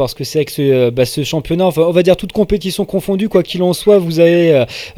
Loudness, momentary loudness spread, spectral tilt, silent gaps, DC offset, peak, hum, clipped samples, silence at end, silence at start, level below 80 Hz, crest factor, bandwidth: -13 LUFS; 7 LU; -6 dB/octave; none; under 0.1%; 0 dBFS; none; under 0.1%; 0.05 s; 0 s; -38 dBFS; 12 dB; 17 kHz